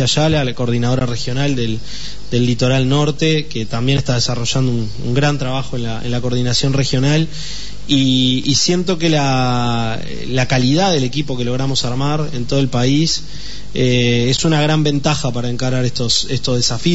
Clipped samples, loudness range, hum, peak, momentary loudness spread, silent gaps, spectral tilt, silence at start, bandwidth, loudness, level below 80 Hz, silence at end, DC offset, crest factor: under 0.1%; 2 LU; none; -2 dBFS; 8 LU; none; -5 dB/octave; 0 s; 8 kHz; -16 LUFS; -36 dBFS; 0 s; 8%; 14 dB